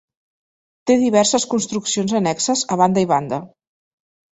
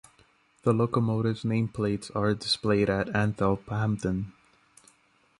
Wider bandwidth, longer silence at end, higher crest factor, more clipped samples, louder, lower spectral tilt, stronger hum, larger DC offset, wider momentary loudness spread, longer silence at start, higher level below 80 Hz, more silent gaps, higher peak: second, 8.2 kHz vs 11.5 kHz; second, 0.85 s vs 1.1 s; about the same, 18 dB vs 18 dB; neither; first, -18 LUFS vs -27 LUFS; second, -4 dB/octave vs -6.5 dB/octave; neither; neither; about the same, 7 LU vs 5 LU; first, 0.85 s vs 0.65 s; second, -60 dBFS vs -52 dBFS; neither; first, -2 dBFS vs -10 dBFS